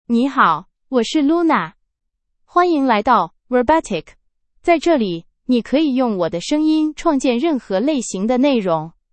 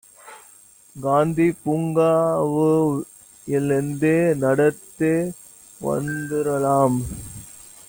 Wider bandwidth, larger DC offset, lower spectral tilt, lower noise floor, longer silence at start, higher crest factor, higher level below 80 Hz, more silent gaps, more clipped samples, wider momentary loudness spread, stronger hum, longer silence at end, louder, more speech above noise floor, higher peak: second, 8.8 kHz vs 17 kHz; neither; second, -5 dB/octave vs -7 dB/octave; first, -73 dBFS vs -50 dBFS; second, 0.1 s vs 0.25 s; about the same, 16 dB vs 16 dB; about the same, -50 dBFS vs -52 dBFS; neither; neither; second, 7 LU vs 15 LU; neither; about the same, 0.25 s vs 0.25 s; first, -17 LUFS vs -21 LUFS; first, 57 dB vs 30 dB; first, 0 dBFS vs -6 dBFS